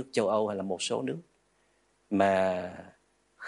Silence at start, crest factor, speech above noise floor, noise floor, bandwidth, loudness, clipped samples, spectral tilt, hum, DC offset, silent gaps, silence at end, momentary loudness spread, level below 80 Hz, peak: 0 s; 18 dB; 41 dB; -70 dBFS; 11.5 kHz; -29 LUFS; under 0.1%; -4.5 dB/octave; none; under 0.1%; none; 0 s; 16 LU; -76 dBFS; -12 dBFS